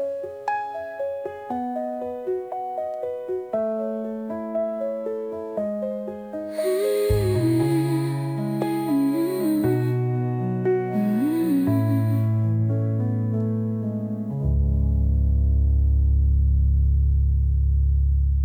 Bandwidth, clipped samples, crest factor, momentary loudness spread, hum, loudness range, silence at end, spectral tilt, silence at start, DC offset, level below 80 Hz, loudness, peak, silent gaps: 16 kHz; under 0.1%; 14 dB; 9 LU; none; 7 LU; 0 s; -8.5 dB/octave; 0 s; under 0.1%; -26 dBFS; -24 LUFS; -8 dBFS; none